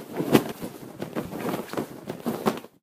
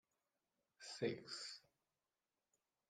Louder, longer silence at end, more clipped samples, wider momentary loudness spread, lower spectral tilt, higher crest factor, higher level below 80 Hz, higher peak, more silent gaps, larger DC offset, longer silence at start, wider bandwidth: first, -29 LUFS vs -48 LUFS; second, 0.15 s vs 1.3 s; neither; about the same, 14 LU vs 14 LU; first, -5.5 dB/octave vs -4 dB/octave; about the same, 28 dB vs 26 dB; first, -60 dBFS vs under -90 dBFS; first, 0 dBFS vs -28 dBFS; neither; neither; second, 0 s vs 0.8 s; first, 15.5 kHz vs 13.5 kHz